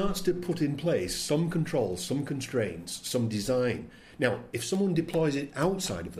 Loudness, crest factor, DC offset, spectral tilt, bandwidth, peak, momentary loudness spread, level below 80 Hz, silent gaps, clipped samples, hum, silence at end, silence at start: -30 LUFS; 18 dB; under 0.1%; -5 dB/octave; 15.5 kHz; -12 dBFS; 4 LU; -50 dBFS; none; under 0.1%; none; 0 s; 0 s